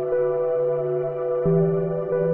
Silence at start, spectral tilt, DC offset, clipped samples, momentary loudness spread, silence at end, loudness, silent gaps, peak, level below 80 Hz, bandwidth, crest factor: 0 s; -12.5 dB/octave; under 0.1%; under 0.1%; 5 LU; 0 s; -23 LUFS; none; -10 dBFS; -56 dBFS; 3.1 kHz; 14 dB